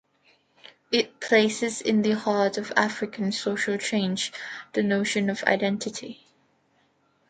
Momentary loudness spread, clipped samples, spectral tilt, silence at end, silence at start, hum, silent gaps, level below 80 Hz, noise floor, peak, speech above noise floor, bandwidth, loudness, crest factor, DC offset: 9 LU; under 0.1%; -4 dB/octave; 1.15 s; 0.9 s; none; none; -70 dBFS; -67 dBFS; -2 dBFS; 41 dB; 9.4 kHz; -25 LUFS; 24 dB; under 0.1%